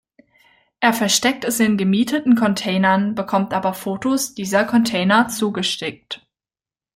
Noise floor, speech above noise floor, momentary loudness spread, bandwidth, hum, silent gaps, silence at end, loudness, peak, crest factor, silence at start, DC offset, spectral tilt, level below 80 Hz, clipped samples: under -90 dBFS; over 72 dB; 7 LU; 16.5 kHz; none; none; 0.8 s; -18 LUFS; -2 dBFS; 18 dB; 0.8 s; under 0.1%; -4 dB/octave; -60 dBFS; under 0.1%